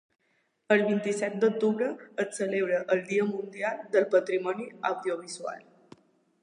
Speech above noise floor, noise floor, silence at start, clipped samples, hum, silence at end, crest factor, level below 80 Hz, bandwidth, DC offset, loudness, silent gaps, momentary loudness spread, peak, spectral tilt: 45 dB; -73 dBFS; 0.7 s; under 0.1%; none; 0.8 s; 18 dB; -84 dBFS; 11 kHz; under 0.1%; -28 LUFS; none; 9 LU; -10 dBFS; -5 dB/octave